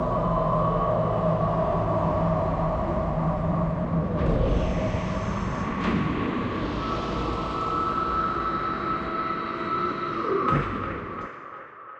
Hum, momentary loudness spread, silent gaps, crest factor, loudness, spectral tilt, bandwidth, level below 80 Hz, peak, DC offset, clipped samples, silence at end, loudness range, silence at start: none; 5 LU; none; 14 dB; -26 LUFS; -8 dB/octave; 8.2 kHz; -36 dBFS; -10 dBFS; under 0.1%; under 0.1%; 0 s; 3 LU; 0 s